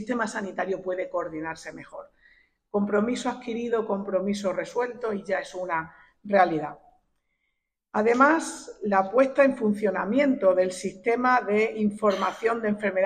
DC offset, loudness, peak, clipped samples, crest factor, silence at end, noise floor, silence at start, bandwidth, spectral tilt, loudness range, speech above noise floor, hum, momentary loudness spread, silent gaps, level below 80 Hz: under 0.1%; -25 LUFS; -6 dBFS; under 0.1%; 20 dB; 0 s; -79 dBFS; 0 s; 10 kHz; -5.5 dB/octave; 7 LU; 54 dB; none; 12 LU; none; -64 dBFS